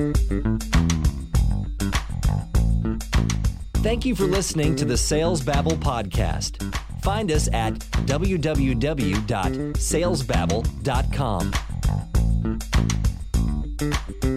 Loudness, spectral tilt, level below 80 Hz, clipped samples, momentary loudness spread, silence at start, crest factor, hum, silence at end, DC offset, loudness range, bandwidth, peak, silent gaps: -24 LUFS; -5.5 dB/octave; -26 dBFS; under 0.1%; 4 LU; 0 s; 14 dB; none; 0 s; under 0.1%; 2 LU; 14 kHz; -8 dBFS; none